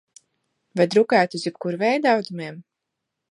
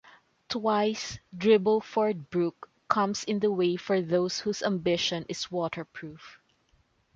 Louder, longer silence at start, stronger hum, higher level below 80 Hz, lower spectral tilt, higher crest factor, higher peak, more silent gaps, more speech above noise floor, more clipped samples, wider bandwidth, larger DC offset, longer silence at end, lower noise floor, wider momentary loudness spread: first, -21 LUFS vs -28 LUFS; first, 0.75 s vs 0.5 s; neither; second, -76 dBFS vs -66 dBFS; about the same, -5.5 dB/octave vs -5 dB/octave; about the same, 20 dB vs 22 dB; first, -2 dBFS vs -8 dBFS; neither; first, 61 dB vs 40 dB; neither; first, 11.5 kHz vs 7.6 kHz; neither; about the same, 0.7 s vs 0.8 s; first, -81 dBFS vs -68 dBFS; first, 15 LU vs 12 LU